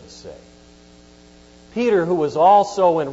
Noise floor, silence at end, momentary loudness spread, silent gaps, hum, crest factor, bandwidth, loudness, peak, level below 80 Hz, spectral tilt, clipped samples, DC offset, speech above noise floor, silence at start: -47 dBFS; 0 s; 21 LU; none; none; 16 dB; 8 kHz; -17 LUFS; -4 dBFS; -54 dBFS; -6 dB/octave; under 0.1%; under 0.1%; 31 dB; 0.25 s